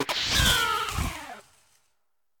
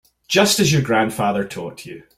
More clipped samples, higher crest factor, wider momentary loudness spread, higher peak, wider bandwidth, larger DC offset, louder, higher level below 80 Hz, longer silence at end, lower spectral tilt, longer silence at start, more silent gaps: neither; about the same, 20 dB vs 18 dB; about the same, 17 LU vs 17 LU; second, -8 dBFS vs -2 dBFS; about the same, 17.5 kHz vs 16 kHz; neither; second, -24 LUFS vs -17 LUFS; first, -38 dBFS vs -52 dBFS; first, 1 s vs 0.15 s; second, -2 dB/octave vs -4 dB/octave; second, 0 s vs 0.3 s; neither